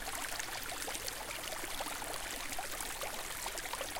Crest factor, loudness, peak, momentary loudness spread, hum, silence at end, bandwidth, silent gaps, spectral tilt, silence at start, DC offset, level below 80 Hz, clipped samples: 22 dB; -39 LUFS; -20 dBFS; 1 LU; none; 0 s; 17 kHz; none; -0.5 dB/octave; 0 s; under 0.1%; -54 dBFS; under 0.1%